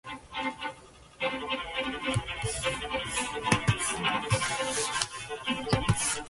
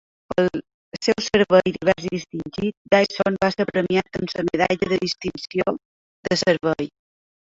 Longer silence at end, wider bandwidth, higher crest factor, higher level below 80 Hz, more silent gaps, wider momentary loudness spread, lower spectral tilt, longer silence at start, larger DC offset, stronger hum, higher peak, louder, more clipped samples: second, 0 s vs 0.65 s; first, 12 kHz vs 7.8 kHz; first, 26 dB vs 20 dB; about the same, -48 dBFS vs -52 dBFS; second, none vs 0.74-0.92 s, 2.77-2.85 s, 5.85-6.23 s; second, 8 LU vs 11 LU; second, -3.5 dB/octave vs -5 dB/octave; second, 0.05 s vs 0.3 s; neither; neither; about the same, -4 dBFS vs -2 dBFS; second, -30 LUFS vs -22 LUFS; neither